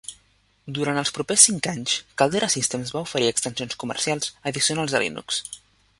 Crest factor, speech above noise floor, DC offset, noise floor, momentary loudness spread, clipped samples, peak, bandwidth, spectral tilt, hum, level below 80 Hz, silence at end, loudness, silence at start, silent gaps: 24 dB; 39 dB; under 0.1%; -62 dBFS; 14 LU; under 0.1%; 0 dBFS; 13 kHz; -2 dB/octave; none; -60 dBFS; 0.45 s; -22 LUFS; 0.1 s; none